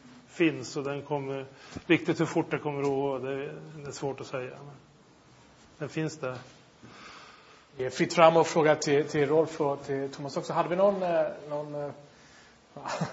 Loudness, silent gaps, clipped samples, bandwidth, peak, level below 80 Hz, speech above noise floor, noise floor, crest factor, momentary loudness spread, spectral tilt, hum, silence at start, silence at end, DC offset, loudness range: -28 LUFS; none; under 0.1%; 8 kHz; -4 dBFS; -68 dBFS; 29 dB; -57 dBFS; 26 dB; 19 LU; -5.5 dB/octave; none; 0.05 s; 0 s; under 0.1%; 13 LU